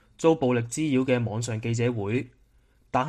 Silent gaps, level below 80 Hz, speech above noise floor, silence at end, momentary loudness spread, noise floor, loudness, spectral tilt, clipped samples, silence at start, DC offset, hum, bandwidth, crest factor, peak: none; -58 dBFS; 37 dB; 0 s; 7 LU; -61 dBFS; -26 LUFS; -6 dB/octave; under 0.1%; 0.2 s; under 0.1%; none; 12 kHz; 18 dB; -8 dBFS